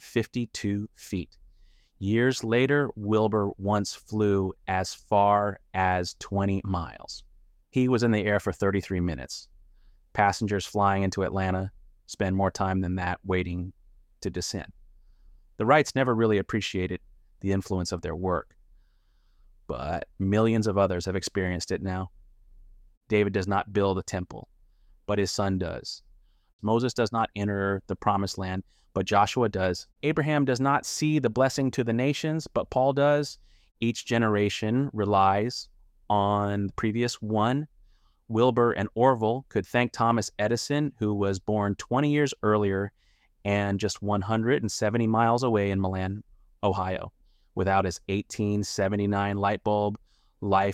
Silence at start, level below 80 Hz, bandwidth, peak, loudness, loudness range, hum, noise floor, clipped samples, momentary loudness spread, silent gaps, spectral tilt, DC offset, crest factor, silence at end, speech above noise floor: 0.05 s; -54 dBFS; 15 kHz; -8 dBFS; -27 LUFS; 4 LU; none; -62 dBFS; under 0.1%; 12 LU; 22.97-23.01 s, 26.53-26.59 s; -6 dB/octave; under 0.1%; 20 dB; 0 s; 36 dB